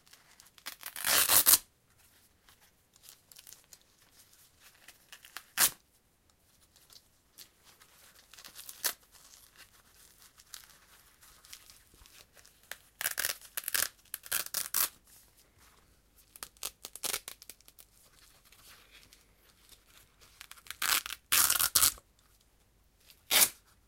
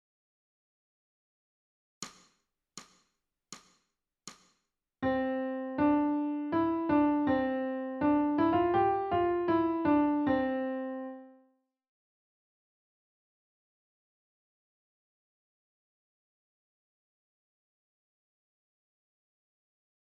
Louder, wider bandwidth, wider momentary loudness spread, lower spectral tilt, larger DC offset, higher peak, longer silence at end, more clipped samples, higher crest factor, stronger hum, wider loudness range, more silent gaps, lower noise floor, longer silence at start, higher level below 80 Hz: about the same, -28 LUFS vs -30 LUFS; first, 17 kHz vs 8 kHz; first, 28 LU vs 23 LU; second, 1.5 dB/octave vs -6.5 dB/octave; neither; first, -2 dBFS vs -16 dBFS; second, 0.35 s vs 8.8 s; neither; first, 36 dB vs 18 dB; neither; about the same, 17 LU vs 18 LU; neither; second, -69 dBFS vs -81 dBFS; second, 0.65 s vs 2 s; about the same, -66 dBFS vs -64 dBFS